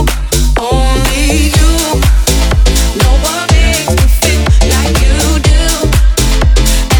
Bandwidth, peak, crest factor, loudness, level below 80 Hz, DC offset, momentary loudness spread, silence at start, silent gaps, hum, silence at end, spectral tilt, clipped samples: over 20 kHz; 0 dBFS; 8 dB; -10 LUFS; -10 dBFS; under 0.1%; 2 LU; 0 s; none; none; 0 s; -4 dB/octave; 0.5%